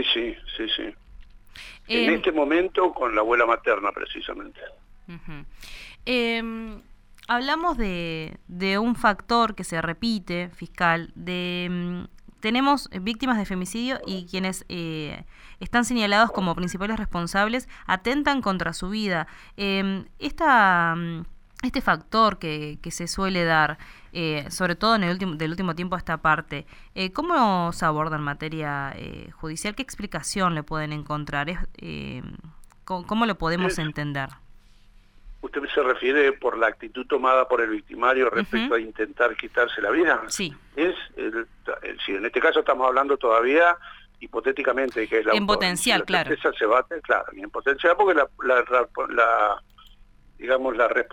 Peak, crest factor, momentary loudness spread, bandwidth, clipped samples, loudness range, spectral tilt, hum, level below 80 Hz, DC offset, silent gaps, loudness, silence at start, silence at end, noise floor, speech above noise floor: -6 dBFS; 20 dB; 15 LU; 17.5 kHz; under 0.1%; 7 LU; -4.5 dB/octave; none; -44 dBFS; under 0.1%; none; -24 LUFS; 0 s; 0.05 s; -52 dBFS; 28 dB